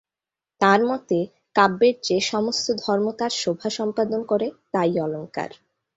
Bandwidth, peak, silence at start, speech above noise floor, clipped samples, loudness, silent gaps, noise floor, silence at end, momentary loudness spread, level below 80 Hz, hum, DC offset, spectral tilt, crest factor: 8 kHz; -2 dBFS; 0.6 s; 67 dB; under 0.1%; -22 LUFS; none; -89 dBFS; 0.5 s; 8 LU; -66 dBFS; none; under 0.1%; -4 dB/octave; 20 dB